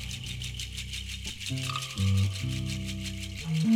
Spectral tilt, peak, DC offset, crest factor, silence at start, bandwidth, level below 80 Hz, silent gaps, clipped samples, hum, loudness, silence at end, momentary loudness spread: -4.5 dB/octave; -14 dBFS; under 0.1%; 16 dB; 0 s; 16 kHz; -44 dBFS; none; under 0.1%; none; -32 LUFS; 0 s; 8 LU